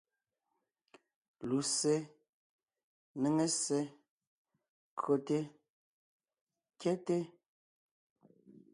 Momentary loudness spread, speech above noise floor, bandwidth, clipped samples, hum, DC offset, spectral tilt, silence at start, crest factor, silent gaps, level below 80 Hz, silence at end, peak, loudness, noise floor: 16 LU; 54 dB; 11.5 kHz; under 0.1%; none; under 0.1%; -4.5 dB/octave; 1.4 s; 20 dB; 2.29-2.59 s, 2.84-3.14 s, 4.10-4.21 s, 4.27-4.45 s, 4.69-4.97 s, 5.70-6.20 s, 6.41-6.47 s; -80 dBFS; 1.45 s; -20 dBFS; -35 LUFS; -88 dBFS